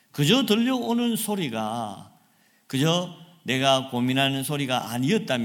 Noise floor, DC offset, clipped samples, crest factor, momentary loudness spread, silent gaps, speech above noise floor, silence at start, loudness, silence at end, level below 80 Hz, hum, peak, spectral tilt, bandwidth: -62 dBFS; under 0.1%; under 0.1%; 20 dB; 11 LU; none; 38 dB; 0.15 s; -24 LUFS; 0 s; -68 dBFS; none; -6 dBFS; -4.5 dB/octave; 17.5 kHz